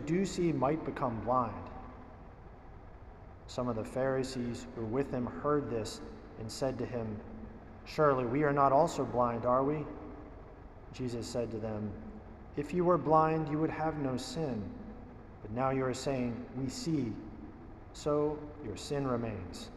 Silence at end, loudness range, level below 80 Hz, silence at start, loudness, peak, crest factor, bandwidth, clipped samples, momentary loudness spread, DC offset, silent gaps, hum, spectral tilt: 0 s; 7 LU; -54 dBFS; 0 s; -34 LUFS; -14 dBFS; 20 dB; 14 kHz; under 0.1%; 21 LU; under 0.1%; none; none; -6.5 dB/octave